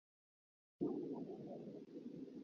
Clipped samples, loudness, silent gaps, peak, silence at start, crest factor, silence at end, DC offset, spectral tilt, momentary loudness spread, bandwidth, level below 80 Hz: under 0.1%; -49 LUFS; none; -30 dBFS; 0.8 s; 20 dB; 0 s; under 0.1%; -9.5 dB/octave; 9 LU; 6.8 kHz; -86 dBFS